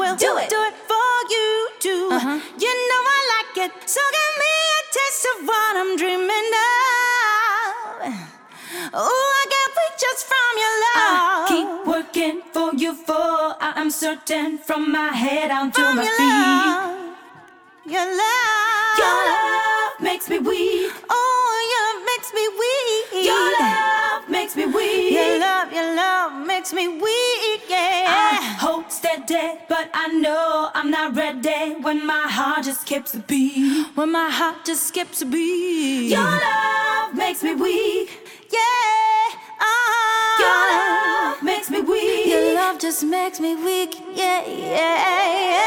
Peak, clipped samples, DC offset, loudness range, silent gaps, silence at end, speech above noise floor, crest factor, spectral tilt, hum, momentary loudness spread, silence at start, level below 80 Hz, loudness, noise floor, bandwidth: -4 dBFS; under 0.1%; under 0.1%; 3 LU; none; 0 s; 27 dB; 16 dB; -2 dB/octave; none; 7 LU; 0 s; -64 dBFS; -19 LUFS; -47 dBFS; 17.5 kHz